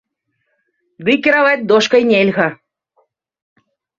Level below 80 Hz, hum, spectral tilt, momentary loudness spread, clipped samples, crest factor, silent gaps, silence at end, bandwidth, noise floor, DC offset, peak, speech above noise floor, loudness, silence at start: -60 dBFS; none; -5 dB/octave; 7 LU; under 0.1%; 16 dB; none; 1.45 s; 7.6 kHz; -70 dBFS; under 0.1%; 0 dBFS; 57 dB; -13 LUFS; 1 s